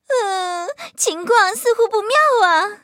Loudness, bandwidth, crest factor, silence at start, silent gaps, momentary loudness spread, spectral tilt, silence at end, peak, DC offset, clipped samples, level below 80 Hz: -16 LUFS; 16.5 kHz; 16 dB; 0.1 s; none; 10 LU; 0.5 dB/octave; 0.1 s; 0 dBFS; under 0.1%; under 0.1%; -80 dBFS